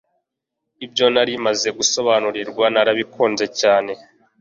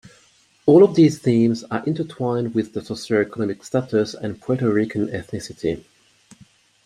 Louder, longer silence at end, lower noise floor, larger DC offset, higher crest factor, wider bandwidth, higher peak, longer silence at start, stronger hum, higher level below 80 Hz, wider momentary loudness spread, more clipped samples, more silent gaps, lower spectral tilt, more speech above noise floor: about the same, -18 LUFS vs -20 LUFS; second, 0.45 s vs 1.05 s; first, -79 dBFS vs -57 dBFS; neither; about the same, 18 dB vs 18 dB; second, 7.6 kHz vs 12 kHz; about the same, -2 dBFS vs -2 dBFS; first, 0.8 s vs 0.65 s; neither; second, -64 dBFS vs -58 dBFS; second, 9 LU vs 14 LU; neither; neither; second, -2 dB/octave vs -7 dB/octave; first, 61 dB vs 37 dB